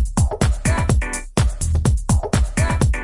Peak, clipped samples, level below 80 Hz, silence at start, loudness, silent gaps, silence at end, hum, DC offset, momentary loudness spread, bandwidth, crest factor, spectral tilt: -4 dBFS; under 0.1%; -22 dBFS; 0 s; -20 LUFS; none; 0 s; none; under 0.1%; 2 LU; 11.5 kHz; 14 dB; -5.5 dB/octave